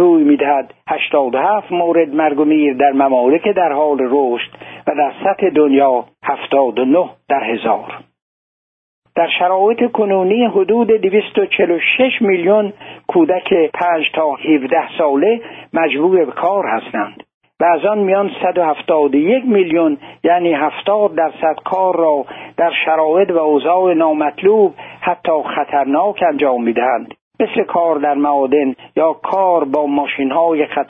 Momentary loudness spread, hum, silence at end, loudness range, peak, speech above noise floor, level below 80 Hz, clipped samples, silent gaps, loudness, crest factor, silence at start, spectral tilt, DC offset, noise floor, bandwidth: 6 LU; none; 0.05 s; 2 LU; -2 dBFS; over 76 dB; -62 dBFS; under 0.1%; 8.22-9.02 s, 17.34-17.41 s, 27.21-27.31 s; -14 LUFS; 12 dB; 0 s; -8.5 dB/octave; under 0.1%; under -90 dBFS; 3.9 kHz